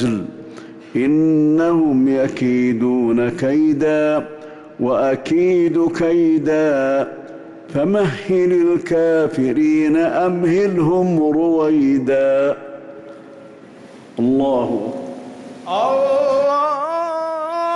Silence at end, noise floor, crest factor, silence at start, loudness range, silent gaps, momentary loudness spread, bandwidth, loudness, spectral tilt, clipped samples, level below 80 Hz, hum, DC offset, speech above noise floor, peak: 0 s; -40 dBFS; 8 dB; 0 s; 4 LU; none; 17 LU; 10.5 kHz; -17 LUFS; -7.5 dB/octave; under 0.1%; -54 dBFS; none; under 0.1%; 24 dB; -8 dBFS